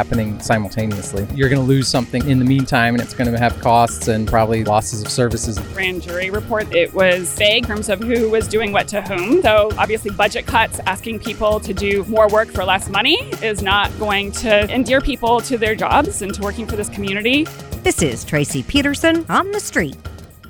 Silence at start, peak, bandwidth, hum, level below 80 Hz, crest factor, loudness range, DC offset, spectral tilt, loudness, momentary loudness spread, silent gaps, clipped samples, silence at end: 0 s; 0 dBFS; 19.5 kHz; none; -34 dBFS; 16 dB; 2 LU; under 0.1%; -4.5 dB/octave; -17 LUFS; 7 LU; none; under 0.1%; 0 s